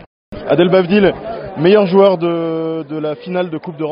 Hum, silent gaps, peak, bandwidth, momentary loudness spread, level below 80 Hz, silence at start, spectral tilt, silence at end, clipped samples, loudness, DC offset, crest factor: none; none; 0 dBFS; 5.4 kHz; 13 LU; -46 dBFS; 0.3 s; -5.5 dB/octave; 0 s; under 0.1%; -14 LUFS; under 0.1%; 14 dB